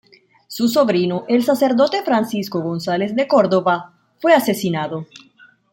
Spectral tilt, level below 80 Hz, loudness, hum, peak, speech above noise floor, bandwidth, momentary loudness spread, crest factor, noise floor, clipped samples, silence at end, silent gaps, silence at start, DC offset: -5.5 dB/octave; -66 dBFS; -18 LUFS; none; -2 dBFS; 27 dB; 17 kHz; 9 LU; 16 dB; -44 dBFS; under 0.1%; 0.7 s; none; 0.5 s; under 0.1%